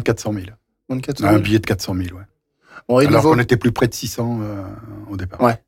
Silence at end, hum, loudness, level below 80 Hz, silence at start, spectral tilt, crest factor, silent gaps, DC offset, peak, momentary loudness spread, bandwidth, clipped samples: 0.1 s; none; -18 LUFS; -44 dBFS; 0 s; -6 dB/octave; 16 dB; none; under 0.1%; -4 dBFS; 17 LU; 17 kHz; under 0.1%